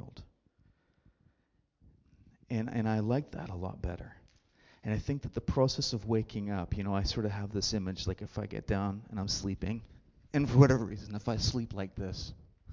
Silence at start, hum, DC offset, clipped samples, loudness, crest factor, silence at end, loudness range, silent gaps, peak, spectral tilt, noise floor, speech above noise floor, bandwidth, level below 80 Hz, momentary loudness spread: 0.05 s; none; under 0.1%; under 0.1%; -33 LUFS; 24 dB; 0 s; 6 LU; none; -10 dBFS; -6 dB/octave; -75 dBFS; 43 dB; 7.6 kHz; -48 dBFS; 11 LU